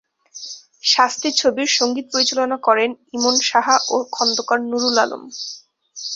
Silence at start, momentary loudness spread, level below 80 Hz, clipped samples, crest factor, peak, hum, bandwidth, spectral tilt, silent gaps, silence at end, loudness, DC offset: 0.35 s; 16 LU; -66 dBFS; under 0.1%; 18 dB; -2 dBFS; none; 8 kHz; -0.5 dB/octave; none; 0 s; -17 LUFS; under 0.1%